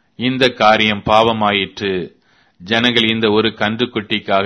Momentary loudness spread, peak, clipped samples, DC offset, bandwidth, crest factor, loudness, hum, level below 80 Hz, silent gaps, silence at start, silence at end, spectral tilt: 9 LU; 0 dBFS; under 0.1%; under 0.1%; 11 kHz; 16 dB; -15 LUFS; none; -48 dBFS; none; 0.2 s; 0 s; -5 dB/octave